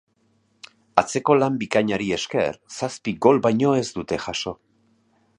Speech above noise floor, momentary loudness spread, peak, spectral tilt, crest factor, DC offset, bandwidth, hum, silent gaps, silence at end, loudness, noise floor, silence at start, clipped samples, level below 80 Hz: 43 dB; 10 LU; 0 dBFS; -5 dB/octave; 22 dB; under 0.1%; 11 kHz; none; none; 0.85 s; -22 LUFS; -65 dBFS; 0.95 s; under 0.1%; -56 dBFS